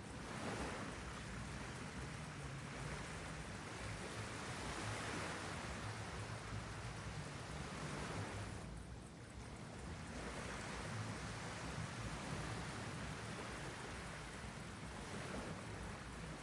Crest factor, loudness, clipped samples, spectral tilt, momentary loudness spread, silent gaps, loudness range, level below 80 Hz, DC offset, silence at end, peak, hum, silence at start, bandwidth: 16 dB; -48 LUFS; under 0.1%; -4.5 dB/octave; 5 LU; none; 2 LU; -58 dBFS; under 0.1%; 0 s; -32 dBFS; none; 0 s; 11.5 kHz